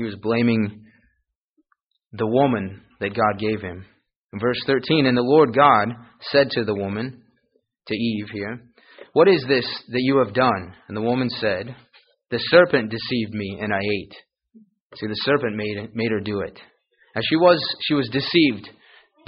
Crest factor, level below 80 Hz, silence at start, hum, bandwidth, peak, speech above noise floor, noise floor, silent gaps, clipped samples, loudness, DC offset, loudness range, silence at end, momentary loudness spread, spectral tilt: 20 dB; -58 dBFS; 0 s; none; 5.4 kHz; -2 dBFS; 51 dB; -72 dBFS; 1.35-1.56 s, 1.82-1.91 s, 4.16-4.29 s, 14.80-14.90 s; under 0.1%; -21 LUFS; under 0.1%; 6 LU; 0.6 s; 15 LU; -4 dB/octave